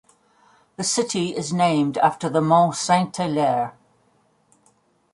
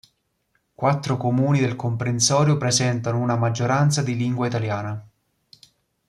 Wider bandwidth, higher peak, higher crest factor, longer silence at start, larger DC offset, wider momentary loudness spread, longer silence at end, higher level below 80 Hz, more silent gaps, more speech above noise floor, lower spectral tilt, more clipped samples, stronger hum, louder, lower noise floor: about the same, 11.5 kHz vs 12.5 kHz; about the same, -4 dBFS vs -4 dBFS; about the same, 18 dB vs 18 dB; about the same, 0.8 s vs 0.8 s; neither; about the same, 7 LU vs 7 LU; first, 1.45 s vs 1.05 s; second, -66 dBFS vs -60 dBFS; neither; second, 42 dB vs 49 dB; about the same, -4.5 dB/octave vs -5 dB/octave; neither; neither; about the same, -21 LUFS vs -21 LUFS; second, -62 dBFS vs -70 dBFS